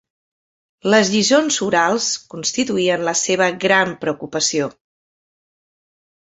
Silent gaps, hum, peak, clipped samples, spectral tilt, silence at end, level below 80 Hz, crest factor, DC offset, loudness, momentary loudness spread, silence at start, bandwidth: none; none; -2 dBFS; under 0.1%; -2.5 dB/octave; 1.6 s; -62 dBFS; 18 dB; under 0.1%; -17 LUFS; 9 LU; 0.85 s; 8.4 kHz